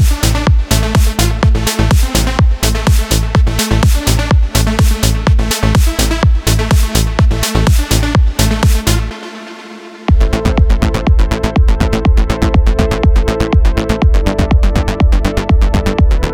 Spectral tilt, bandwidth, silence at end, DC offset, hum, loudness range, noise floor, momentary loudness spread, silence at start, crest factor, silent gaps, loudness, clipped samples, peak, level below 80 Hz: -5 dB/octave; 18 kHz; 0 s; 0.2%; none; 2 LU; -31 dBFS; 2 LU; 0 s; 10 dB; none; -13 LUFS; under 0.1%; 0 dBFS; -12 dBFS